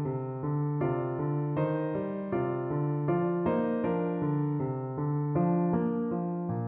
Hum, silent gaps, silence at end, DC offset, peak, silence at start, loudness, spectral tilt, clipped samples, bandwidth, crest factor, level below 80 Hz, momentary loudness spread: none; none; 0 s; under 0.1%; -16 dBFS; 0 s; -30 LUFS; -10 dB/octave; under 0.1%; 3.4 kHz; 14 dB; -62 dBFS; 5 LU